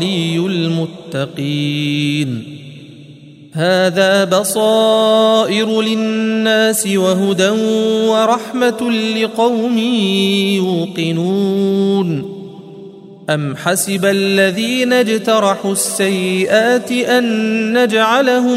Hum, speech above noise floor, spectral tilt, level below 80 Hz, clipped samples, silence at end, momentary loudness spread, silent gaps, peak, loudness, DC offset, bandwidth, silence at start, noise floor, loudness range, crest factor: none; 24 dB; -4.5 dB/octave; -62 dBFS; under 0.1%; 0 s; 8 LU; none; 0 dBFS; -14 LUFS; under 0.1%; 16 kHz; 0 s; -38 dBFS; 5 LU; 14 dB